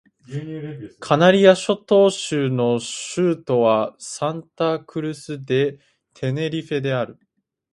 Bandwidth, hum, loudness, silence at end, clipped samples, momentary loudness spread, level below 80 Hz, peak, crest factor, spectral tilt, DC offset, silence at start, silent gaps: 11.5 kHz; none; -20 LUFS; 0.6 s; under 0.1%; 16 LU; -64 dBFS; 0 dBFS; 20 dB; -5.5 dB/octave; under 0.1%; 0.3 s; none